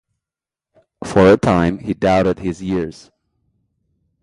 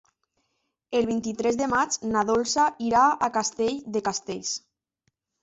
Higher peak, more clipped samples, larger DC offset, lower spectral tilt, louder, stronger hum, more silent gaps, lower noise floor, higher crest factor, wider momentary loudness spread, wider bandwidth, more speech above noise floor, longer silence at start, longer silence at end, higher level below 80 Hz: first, 0 dBFS vs -10 dBFS; neither; neither; first, -7 dB/octave vs -3 dB/octave; first, -16 LUFS vs -25 LUFS; neither; neither; first, -88 dBFS vs -76 dBFS; about the same, 18 dB vs 16 dB; first, 12 LU vs 9 LU; first, 11.5 kHz vs 8.4 kHz; first, 73 dB vs 52 dB; about the same, 1 s vs 0.9 s; first, 1.3 s vs 0.85 s; first, -40 dBFS vs -60 dBFS